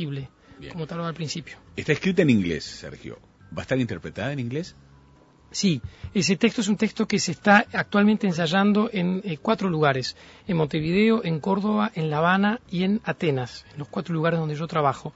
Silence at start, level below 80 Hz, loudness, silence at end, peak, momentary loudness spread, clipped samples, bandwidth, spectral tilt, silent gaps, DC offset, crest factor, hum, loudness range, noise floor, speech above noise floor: 0 s; -54 dBFS; -24 LUFS; 0.05 s; -2 dBFS; 16 LU; under 0.1%; 8 kHz; -5.5 dB/octave; none; under 0.1%; 22 dB; none; 6 LU; -54 dBFS; 30 dB